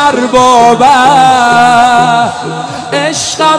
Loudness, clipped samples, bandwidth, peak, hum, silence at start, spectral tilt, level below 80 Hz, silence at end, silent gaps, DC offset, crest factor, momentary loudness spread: -6 LUFS; 6%; 11 kHz; 0 dBFS; none; 0 s; -3 dB/octave; -42 dBFS; 0 s; none; under 0.1%; 6 dB; 10 LU